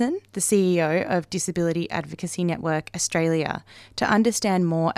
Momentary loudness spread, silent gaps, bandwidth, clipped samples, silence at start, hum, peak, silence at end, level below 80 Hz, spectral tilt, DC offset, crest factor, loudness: 9 LU; none; 15.5 kHz; under 0.1%; 0 s; none; -8 dBFS; 0.05 s; -58 dBFS; -5 dB/octave; under 0.1%; 16 dB; -23 LUFS